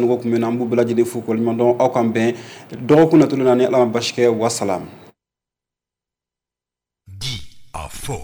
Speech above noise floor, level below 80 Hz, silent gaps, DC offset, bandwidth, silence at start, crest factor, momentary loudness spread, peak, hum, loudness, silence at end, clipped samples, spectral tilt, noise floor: 72 dB; -48 dBFS; none; under 0.1%; over 20 kHz; 0 s; 14 dB; 18 LU; -4 dBFS; 60 Hz at -45 dBFS; -17 LUFS; 0 s; under 0.1%; -6 dB/octave; -88 dBFS